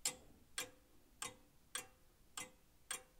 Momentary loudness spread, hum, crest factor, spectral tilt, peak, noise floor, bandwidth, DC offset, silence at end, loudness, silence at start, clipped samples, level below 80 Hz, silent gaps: 11 LU; none; 28 dB; 0.5 dB/octave; -24 dBFS; -67 dBFS; 17.5 kHz; under 0.1%; 0 s; -49 LUFS; 0 s; under 0.1%; -74 dBFS; none